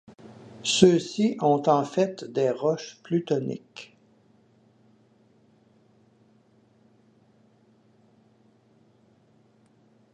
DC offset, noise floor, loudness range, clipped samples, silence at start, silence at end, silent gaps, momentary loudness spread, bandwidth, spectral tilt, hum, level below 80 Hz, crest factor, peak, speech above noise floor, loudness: under 0.1%; -61 dBFS; 12 LU; under 0.1%; 0.25 s; 6.3 s; none; 25 LU; 10.5 kHz; -5 dB/octave; none; -68 dBFS; 28 dB; -2 dBFS; 37 dB; -24 LUFS